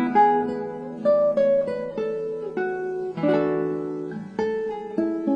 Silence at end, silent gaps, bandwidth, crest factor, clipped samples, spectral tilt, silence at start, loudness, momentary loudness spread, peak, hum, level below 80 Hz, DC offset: 0 s; none; 7.2 kHz; 16 dB; under 0.1%; -8 dB/octave; 0 s; -24 LUFS; 10 LU; -8 dBFS; none; -62 dBFS; under 0.1%